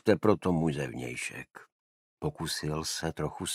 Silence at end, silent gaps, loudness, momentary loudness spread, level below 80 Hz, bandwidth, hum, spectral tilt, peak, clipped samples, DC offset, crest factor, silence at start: 0 s; 1.72-2.17 s; -32 LUFS; 12 LU; -54 dBFS; 16 kHz; none; -5 dB/octave; -8 dBFS; under 0.1%; under 0.1%; 24 dB; 0.05 s